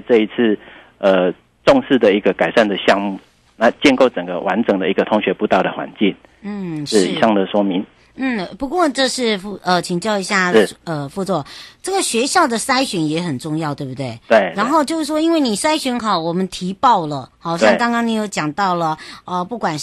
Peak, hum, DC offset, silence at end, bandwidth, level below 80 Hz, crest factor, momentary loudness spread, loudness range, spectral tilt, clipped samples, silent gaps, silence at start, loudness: -2 dBFS; none; under 0.1%; 0 s; 12.5 kHz; -52 dBFS; 16 dB; 11 LU; 3 LU; -4.5 dB/octave; under 0.1%; none; 0.1 s; -17 LUFS